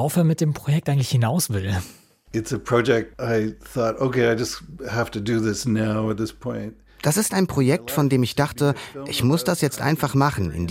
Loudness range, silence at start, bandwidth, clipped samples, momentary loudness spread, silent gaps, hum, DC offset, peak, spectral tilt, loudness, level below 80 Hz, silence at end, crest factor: 2 LU; 0 s; 16.5 kHz; under 0.1%; 9 LU; none; none; under 0.1%; -6 dBFS; -5.5 dB/octave; -22 LUFS; -48 dBFS; 0 s; 16 dB